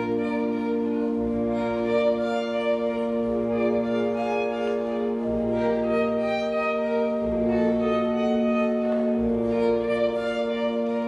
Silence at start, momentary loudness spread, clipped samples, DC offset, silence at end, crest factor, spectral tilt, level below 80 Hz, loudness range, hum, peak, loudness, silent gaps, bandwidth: 0 s; 3 LU; under 0.1%; under 0.1%; 0 s; 12 dB; -7 dB/octave; -50 dBFS; 2 LU; none; -12 dBFS; -25 LUFS; none; 7.8 kHz